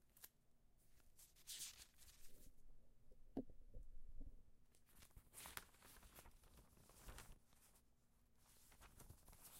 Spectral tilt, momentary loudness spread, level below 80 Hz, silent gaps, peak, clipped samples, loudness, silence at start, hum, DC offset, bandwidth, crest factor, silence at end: -3 dB/octave; 13 LU; -66 dBFS; none; -30 dBFS; under 0.1%; -61 LUFS; 0 s; none; under 0.1%; 16 kHz; 30 dB; 0 s